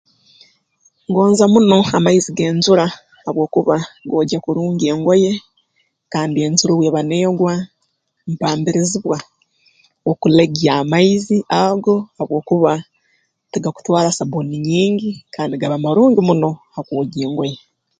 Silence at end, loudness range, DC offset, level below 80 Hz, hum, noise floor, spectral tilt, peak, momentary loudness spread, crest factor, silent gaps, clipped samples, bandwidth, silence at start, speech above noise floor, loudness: 0.45 s; 4 LU; under 0.1%; -56 dBFS; none; -68 dBFS; -5.5 dB/octave; 0 dBFS; 12 LU; 16 dB; none; under 0.1%; 9.4 kHz; 1.1 s; 53 dB; -16 LUFS